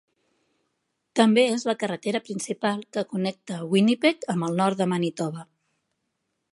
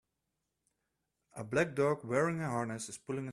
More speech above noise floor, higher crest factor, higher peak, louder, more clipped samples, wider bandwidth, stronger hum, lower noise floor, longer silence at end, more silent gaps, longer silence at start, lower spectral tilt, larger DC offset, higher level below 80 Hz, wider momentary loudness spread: about the same, 54 dB vs 52 dB; about the same, 22 dB vs 18 dB; first, -4 dBFS vs -18 dBFS; first, -24 LUFS vs -34 LUFS; neither; second, 11.5 kHz vs 13 kHz; neither; second, -78 dBFS vs -86 dBFS; first, 1.1 s vs 0 s; neither; second, 1.15 s vs 1.35 s; about the same, -5.5 dB/octave vs -6 dB/octave; neither; second, -76 dBFS vs -70 dBFS; about the same, 11 LU vs 11 LU